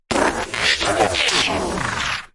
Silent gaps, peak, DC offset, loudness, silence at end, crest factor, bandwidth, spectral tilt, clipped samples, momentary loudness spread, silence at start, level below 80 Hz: none; -2 dBFS; under 0.1%; -18 LUFS; 0.1 s; 18 dB; 11.5 kHz; -2.5 dB/octave; under 0.1%; 6 LU; 0.1 s; -40 dBFS